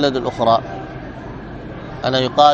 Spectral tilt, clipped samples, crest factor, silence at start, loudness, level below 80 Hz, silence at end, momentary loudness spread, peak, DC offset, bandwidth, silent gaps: -5.5 dB/octave; under 0.1%; 18 dB; 0 s; -18 LUFS; -42 dBFS; 0 s; 16 LU; 0 dBFS; under 0.1%; 7.8 kHz; none